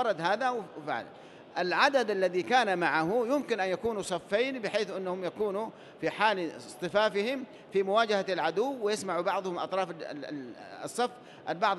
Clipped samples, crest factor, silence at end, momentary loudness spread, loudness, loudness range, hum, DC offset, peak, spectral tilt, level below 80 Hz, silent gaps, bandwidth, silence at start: under 0.1%; 20 dB; 0 s; 12 LU; -30 LUFS; 4 LU; none; under 0.1%; -10 dBFS; -4 dB/octave; -72 dBFS; none; 12.5 kHz; 0 s